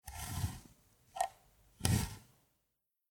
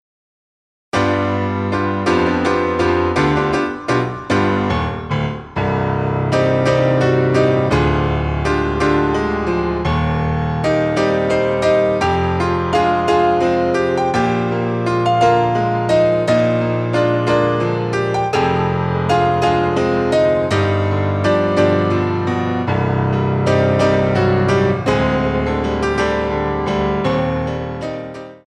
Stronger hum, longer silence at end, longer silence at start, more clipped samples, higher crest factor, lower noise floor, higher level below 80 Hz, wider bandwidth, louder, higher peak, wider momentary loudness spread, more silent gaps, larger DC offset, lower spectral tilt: neither; first, 0.9 s vs 0.1 s; second, 0.05 s vs 0.95 s; neither; first, 30 dB vs 14 dB; second, -85 dBFS vs under -90 dBFS; second, -52 dBFS vs -34 dBFS; first, 19.5 kHz vs 10.5 kHz; second, -39 LUFS vs -17 LUFS; second, -12 dBFS vs -2 dBFS; first, 19 LU vs 5 LU; neither; neither; second, -4.5 dB/octave vs -7 dB/octave